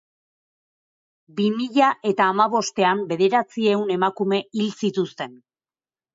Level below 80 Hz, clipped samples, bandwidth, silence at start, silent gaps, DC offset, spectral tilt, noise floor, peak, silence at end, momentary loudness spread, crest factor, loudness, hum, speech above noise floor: -72 dBFS; under 0.1%; 7.8 kHz; 1.35 s; none; under 0.1%; -5 dB/octave; under -90 dBFS; -6 dBFS; 0.8 s; 8 LU; 18 dB; -21 LUFS; none; over 69 dB